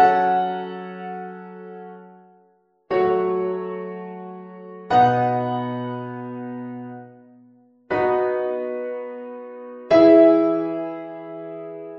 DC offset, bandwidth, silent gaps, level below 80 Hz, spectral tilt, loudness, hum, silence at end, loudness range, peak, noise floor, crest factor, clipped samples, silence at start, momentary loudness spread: under 0.1%; 6.6 kHz; none; -64 dBFS; -8.5 dB/octave; -20 LUFS; none; 0 s; 8 LU; -2 dBFS; -61 dBFS; 20 dB; under 0.1%; 0 s; 22 LU